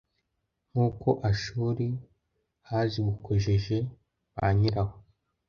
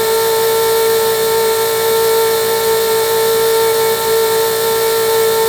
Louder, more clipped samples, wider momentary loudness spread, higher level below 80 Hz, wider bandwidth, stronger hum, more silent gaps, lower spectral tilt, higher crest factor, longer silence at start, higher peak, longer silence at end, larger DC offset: second, -29 LUFS vs -13 LUFS; neither; first, 9 LU vs 1 LU; about the same, -48 dBFS vs -48 dBFS; second, 7 kHz vs over 20 kHz; neither; neither; first, -7.5 dB/octave vs -1.5 dB/octave; first, 20 dB vs 10 dB; first, 0.75 s vs 0 s; second, -10 dBFS vs -2 dBFS; first, 0.5 s vs 0 s; neither